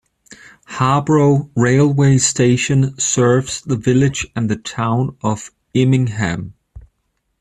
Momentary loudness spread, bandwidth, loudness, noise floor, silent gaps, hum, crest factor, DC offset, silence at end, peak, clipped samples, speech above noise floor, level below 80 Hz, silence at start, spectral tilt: 9 LU; 11 kHz; -16 LUFS; -69 dBFS; none; none; 14 dB; under 0.1%; 0.6 s; -2 dBFS; under 0.1%; 54 dB; -46 dBFS; 0.3 s; -5.5 dB/octave